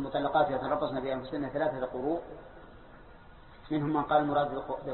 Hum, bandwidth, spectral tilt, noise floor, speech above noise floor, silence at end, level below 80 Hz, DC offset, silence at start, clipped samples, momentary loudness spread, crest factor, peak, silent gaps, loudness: none; 4.3 kHz; -10 dB/octave; -52 dBFS; 21 dB; 0 s; -56 dBFS; under 0.1%; 0 s; under 0.1%; 9 LU; 18 dB; -12 dBFS; none; -31 LUFS